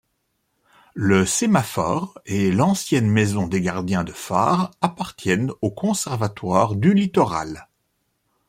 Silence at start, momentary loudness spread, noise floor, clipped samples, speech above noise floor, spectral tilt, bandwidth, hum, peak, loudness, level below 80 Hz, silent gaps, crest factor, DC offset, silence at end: 0.95 s; 8 LU; -72 dBFS; under 0.1%; 52 dB; -5.5 dB/octave; 16 kHz; none; -2 dBFS; -21 LUFS; -54 dBFS; none; 18 dB; under 0.1%; 0.85 s